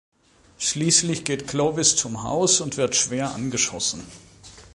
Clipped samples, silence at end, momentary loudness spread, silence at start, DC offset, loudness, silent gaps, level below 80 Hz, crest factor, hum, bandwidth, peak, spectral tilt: under 0.1%; 0.15 s; 8 LU; 0.6 s; under 0.1%; -21 LUFS; none; -54 dBFS; 24 dB; none; 11.5 kHz; 0 dBFS; -2.5 dB/octave